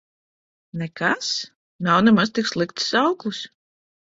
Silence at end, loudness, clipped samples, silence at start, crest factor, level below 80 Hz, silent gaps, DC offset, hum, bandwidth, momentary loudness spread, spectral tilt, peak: 0.7 s; -21 LUFS; under 0.1%; 0.75 s; 20 dB; -62 dBFS; 1.55-1.79 s; under 0.1%; none; 7.8 kHz; 17 LU; -4.5 dB/octave; -4 dBFS